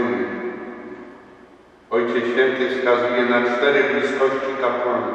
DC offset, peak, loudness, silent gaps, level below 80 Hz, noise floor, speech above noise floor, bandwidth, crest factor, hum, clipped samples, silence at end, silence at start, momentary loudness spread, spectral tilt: under 0.1%; -4 dBFS; -20 LUFS; none; -64 dBFS; -48 dBFS; 29 dB; 8.4 kHz; 16 dB; none; under 0.1%; 0 s; 0 s; 16 LU; -5 dB/octave